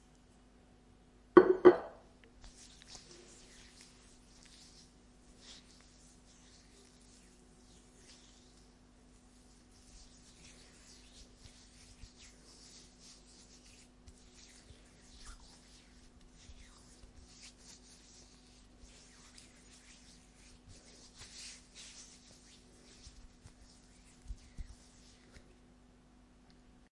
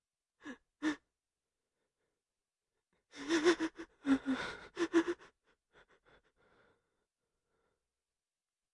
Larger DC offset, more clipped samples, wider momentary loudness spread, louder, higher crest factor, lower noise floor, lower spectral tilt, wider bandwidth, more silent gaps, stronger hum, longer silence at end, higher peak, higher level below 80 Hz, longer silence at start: neither; neither; second, 10 LU vs 21 LU; first, -28 LUFS vs -36 LUFS; first, 36 dB vs 24 dB; second, -63 dBFS vs under -90 dBFS; first, -5 dB/octave vs -3.5 dB/octave; about the same, 11.5 kHz vs 11 kHz; neither; neither; second, 2.35 s vs 3.5 s; first, -4 dBFS vs -16 dBFS; first, -62 dBFS vs -74 dBFS; first, 1.35 s vs 0.45 s